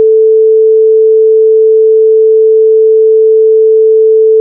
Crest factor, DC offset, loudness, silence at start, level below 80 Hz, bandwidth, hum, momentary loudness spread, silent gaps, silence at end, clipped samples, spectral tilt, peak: 4 dB; under 0.1%; -6 LUFS; 0 s; under -90 dBFS; 0.5 kHz; none; 0 LU; none; 0 s; under 0.1%; -11 dB/octave; -2 dBFS